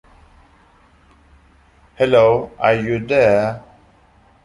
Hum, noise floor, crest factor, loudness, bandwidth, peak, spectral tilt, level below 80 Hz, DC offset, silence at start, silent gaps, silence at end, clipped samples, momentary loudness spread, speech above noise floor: none; -52 dBFS; 18 dB; -16 LUFS; 11 kHz; -2 dBFS; -7 dB/octave; -48 dBFS; under 0.1%; 2 s; none; 0.85 s; under 0.1%; 8 LU; 37 dB